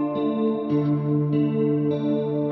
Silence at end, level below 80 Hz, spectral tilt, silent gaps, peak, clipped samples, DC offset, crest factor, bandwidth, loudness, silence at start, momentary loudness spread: 0 s; -64 dBFS; -11 dB/octave; none; -12 dBFS; under 0.1%; under 0.1%; 10 dB; 4.6 kHz; -23 LUFS; 0 s; 2 LU